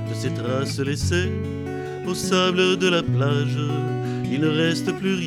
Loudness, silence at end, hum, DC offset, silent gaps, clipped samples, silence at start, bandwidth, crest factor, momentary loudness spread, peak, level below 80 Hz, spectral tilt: -22 LUFS; 0 s; none; under 0.1%; none; under 0.1%; 0 s; 14.5 kHz; 16 dB; 9 LU; -6 dBFS; -50 dBFS; -5.5 dB/octave